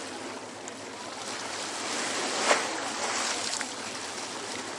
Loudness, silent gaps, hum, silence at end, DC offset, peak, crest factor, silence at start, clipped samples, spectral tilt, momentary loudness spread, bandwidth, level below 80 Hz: -31 LUFS; none; none; 0 s; under 0.1%; -8 dBFS; 24 dB; 0 s; under 0.1%; -0.5 dB/octave; 13 LU; 11.5 kHz; -80 dBFS